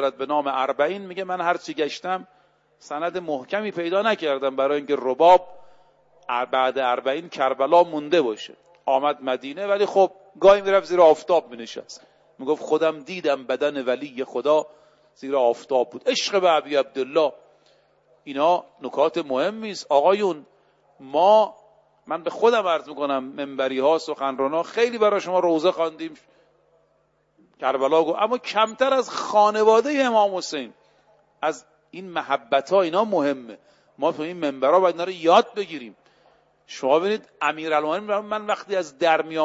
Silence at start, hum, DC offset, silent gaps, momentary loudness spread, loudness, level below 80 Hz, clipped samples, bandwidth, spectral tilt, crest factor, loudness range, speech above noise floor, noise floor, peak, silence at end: 0 s; none; under 0.1%; none; 13 LU; -22 LUFS; -68 dBFS; under 0.1%; 8 kHz; -4 dB/octave; 18 dB; 5 LU; 44 dB; -65 dBFS; -4 dBFS; 0 s